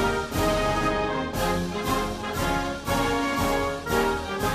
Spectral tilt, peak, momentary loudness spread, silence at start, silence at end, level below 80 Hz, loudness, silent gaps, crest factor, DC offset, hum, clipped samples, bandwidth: -4.5 dB/octave; -10 dBFS; 3 LU; 0 s; 0 s; -38 dBFS; -26 LUFS; none; 14 dB; under 0.1%; none; under 0.1%; 15 kHz